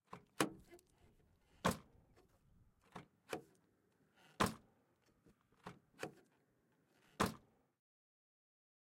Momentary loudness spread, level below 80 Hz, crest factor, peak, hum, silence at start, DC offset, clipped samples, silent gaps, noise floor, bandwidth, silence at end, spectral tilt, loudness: 19 LU; -70 dBFS; 32 dB; -16 dBFS; none; 0.1 s; under 0.1%; under 0.1%; none; -78 dBFS; 16 kHz; 1.45 s; -4 dB/octave; -43 LUFS